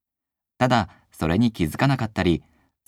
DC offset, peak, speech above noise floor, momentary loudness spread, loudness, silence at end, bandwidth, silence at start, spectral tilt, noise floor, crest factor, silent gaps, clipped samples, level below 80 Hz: under 0.1%; -6 dBFS; 66 dB; 7 LU; -23 LUFS; 0.5 s; 15.5 kHz; 0.6 s; -6.5 dB/octave; -87 dBFS; 18 dB; none; under 0.1%; -44 dBFS